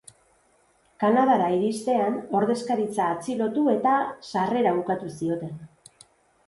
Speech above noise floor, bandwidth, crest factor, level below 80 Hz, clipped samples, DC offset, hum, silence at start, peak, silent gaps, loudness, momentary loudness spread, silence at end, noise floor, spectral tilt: 40 dB; 11.5 kHz; 16 dB; -66 dBFS; under 0.1%; under 0.1%; none; 1 s; -8 dBFS; none; -24 LUFS; 8 LU; 0.8 s; -63 dBFS; -6 dB/octave